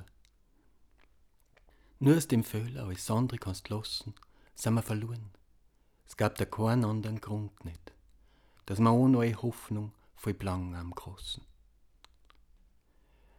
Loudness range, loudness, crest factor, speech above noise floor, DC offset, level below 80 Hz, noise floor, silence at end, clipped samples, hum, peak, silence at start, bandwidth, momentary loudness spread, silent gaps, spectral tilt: 8 LU; -32 LUFS; 20 dB; 35 dB; under 0.1%; -60 dBFS; -66 dBFS; 2 s; under 0.1%; none; -12 dBFS; 0 s; 18.5 kHz; 18 LU; none; -6.5 dB/octave